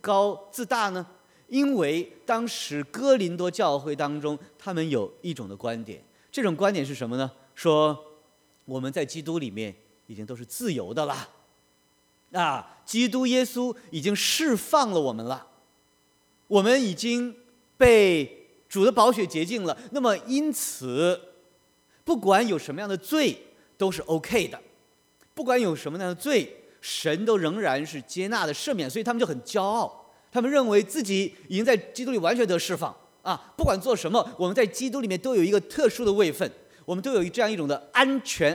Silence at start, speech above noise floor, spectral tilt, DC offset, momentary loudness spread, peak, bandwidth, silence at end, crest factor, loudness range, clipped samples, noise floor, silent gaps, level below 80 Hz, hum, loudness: 0.05 s; 40 dB; -4.5 dB/octave; under 0.1%; 12 LU; -4 dBFS; over 20 kHz; 0 s; 22 dB; 7 LU; under 0.1%; -65 dBFS; none; -54 dBFS; none; -25 LUFS